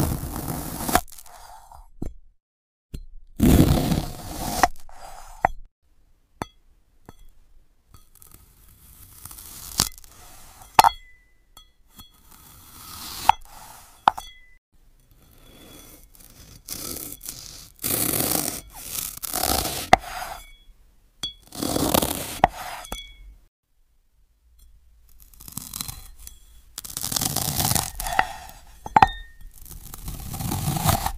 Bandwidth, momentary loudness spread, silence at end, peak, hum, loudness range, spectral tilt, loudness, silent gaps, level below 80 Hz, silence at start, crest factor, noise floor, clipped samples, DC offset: 16 kHz; 25 LU; 0 s; 0 dBFS; none; 15 LU; -3.5 dB/octave; -24 LUFS; 2.42-2.89 s, 5.71-5.82 s, 14.58-14.72 s, 23.48-23.63 s; -38 dBFS; 0 s; 26 dB; -62 dBFS; under 0.1%; under 0.1%